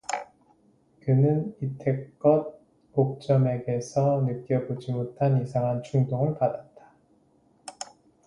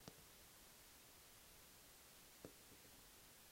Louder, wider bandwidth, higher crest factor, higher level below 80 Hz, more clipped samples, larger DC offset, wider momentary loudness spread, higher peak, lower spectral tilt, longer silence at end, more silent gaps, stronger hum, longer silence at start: first, -26 LUFS vs -63 LUFS; second, 11 kHz vs 16 kHz; second, 20 dB vs 28 dB; first, -62 dBFS vs -78 dBFS; neither; neither; first, 17 LU vs 2 LU; first, -8 dBFS vs -36 dBFS; first, -8 dB/octave vs -2.5 dB/octave; first, 0.45 s vs 0 s; neither; neither; about the same, 0.1 s vs 0 s